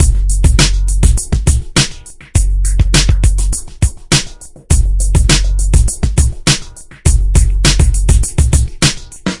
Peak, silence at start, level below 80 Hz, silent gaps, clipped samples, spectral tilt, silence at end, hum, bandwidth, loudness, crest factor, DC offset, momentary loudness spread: 0 dBFS; 0 s; -12 dBFS; none; 0.2%; -3.5 dB/octave; 0 s; none; 11.5 kHz; -13 LUFS; 12 dB; 1%; 6 LU